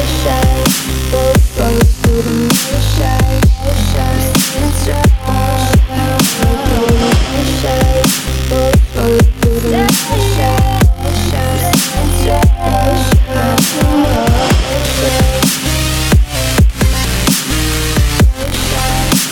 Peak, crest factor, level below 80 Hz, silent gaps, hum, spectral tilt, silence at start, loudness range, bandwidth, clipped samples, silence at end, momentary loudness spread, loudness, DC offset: 0 dBFS; 10 dB; -16 dBFS; none; none; -4.5 dB/octave; 0 s; 1 LU; 17.5 kHz; under 0.1%; 0 s; 3 LU; -12 LUFS; 0.3%